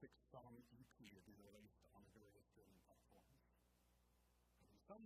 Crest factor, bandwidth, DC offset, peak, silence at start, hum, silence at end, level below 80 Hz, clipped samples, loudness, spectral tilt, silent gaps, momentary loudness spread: 22 dB; 15 kHz; under 0.1%; -46 dBFS; 0 s; 60 Hz at -80 dBFS; 0 s; -82 dBFS; under 0.1%; -66 LUFS; -5.5 dB/octave; none; 4 LU